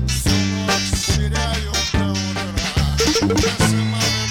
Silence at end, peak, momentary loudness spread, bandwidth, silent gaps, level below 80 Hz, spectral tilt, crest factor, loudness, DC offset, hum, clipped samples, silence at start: 0 s; -2 dBFS; 5 LU; 17 kHz; none; -26 dBFS; -4 dB/octave; 16 dB; -19 LUFS; under 0.1%; none; under 0.1%; 0 s